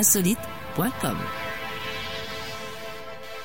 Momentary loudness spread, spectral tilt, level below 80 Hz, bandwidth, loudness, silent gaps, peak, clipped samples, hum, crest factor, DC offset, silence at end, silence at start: 13 LU; -3 dB/octave; -52 dBFS; 16.5 kHz; -28 LUFS; none; -6 dBFS; under 0.1%; none; 22 dB; 0.9%; 0 s; 0 s